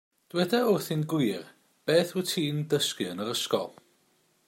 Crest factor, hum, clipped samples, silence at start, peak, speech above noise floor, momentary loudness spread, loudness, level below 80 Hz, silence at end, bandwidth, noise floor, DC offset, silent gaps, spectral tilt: 18 dB; none; under 0.1%; 0.35 s; -10 dBFS; 41 dB; 9 LU; -28 LUFS; -74 dBFS; 0.75 s; 16.5 kHz; -68 dBFS; under 0.1%; none; -4.5 dB/octave